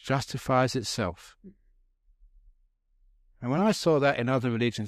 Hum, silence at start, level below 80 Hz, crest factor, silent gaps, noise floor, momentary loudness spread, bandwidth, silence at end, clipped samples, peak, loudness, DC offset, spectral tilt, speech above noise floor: none; 0.05 s; -58 dBFS; 18 dB; none; -67 dBFS; 9 LU; 15 kHz; 0 s; under 0.1%; -10 dBFS; -27 LUFS; under 0.1%; -5.5 dB/octave; 40 dB